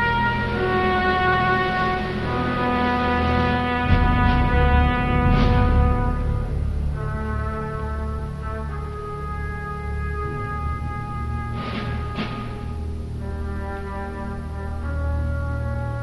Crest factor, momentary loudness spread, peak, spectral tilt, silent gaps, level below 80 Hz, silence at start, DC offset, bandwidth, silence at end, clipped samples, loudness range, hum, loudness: 18 dB; 12 LU; -4 dBFS; -7.5 dB/octave; none; -26 dBFS; 0 s; under 0.1%; 11.5 kHz; 0 s; under 0.1%; 9 LU; none; -23 LUFS